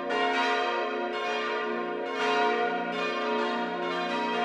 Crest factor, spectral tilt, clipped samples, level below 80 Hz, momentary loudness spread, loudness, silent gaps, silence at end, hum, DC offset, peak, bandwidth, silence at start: 14 dB; -3.5 dB/octave; under 0.1%; -76 dBFS; 5 LU; -28 LUFS; none; 0 s; none; under 0.1%; -14 dBFS; 11 kHz; 0 s